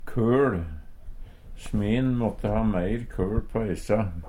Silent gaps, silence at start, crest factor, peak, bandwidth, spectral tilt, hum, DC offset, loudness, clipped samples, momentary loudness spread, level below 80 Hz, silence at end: none; 0 s; 14 dB; -10 dBFS; 14 kHz; -8 dB/octave; none; under 0.1%; -26 LUFS; under 0.1%; 10 LU; -36 dBFS; 0 s